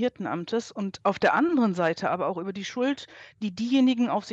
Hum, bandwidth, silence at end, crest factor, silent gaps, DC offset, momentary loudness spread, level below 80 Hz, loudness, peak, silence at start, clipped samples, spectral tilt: none; 8 kHz; 0 s; 16 dB; none; under 0.1%; 12 LU; -70 dBFS; -26 LUFS; -10 dBFS; 0 s; under 0.1%; -5.5 dB/octave